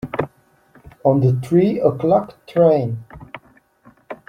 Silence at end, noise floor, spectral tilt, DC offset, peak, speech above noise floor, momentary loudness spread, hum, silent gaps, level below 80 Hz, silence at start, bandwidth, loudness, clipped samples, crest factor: 0.15 s; -54 dBFS; -9.5 dB/octave; under 0.1%; -2 dBFS; 38 dB; 22 LU; none; none; -54 dBFS; 0.05 s; 10 kHz; -18 LUFS; under 0.1%; 16 dB